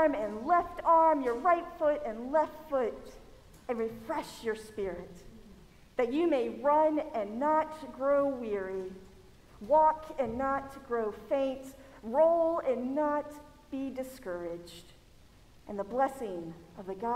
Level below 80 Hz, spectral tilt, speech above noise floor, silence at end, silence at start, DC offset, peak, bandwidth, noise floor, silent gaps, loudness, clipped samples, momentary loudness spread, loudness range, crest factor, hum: -58 dBFS; -6 dB/octave; 27 dB; 0 s; 0 s; under 0.1%; -14 dBFS; 15.5 kHz; -57 dBFS; none; -31 LUFS; under 0.1%; 19 LU; 8 LU; 18 dB; none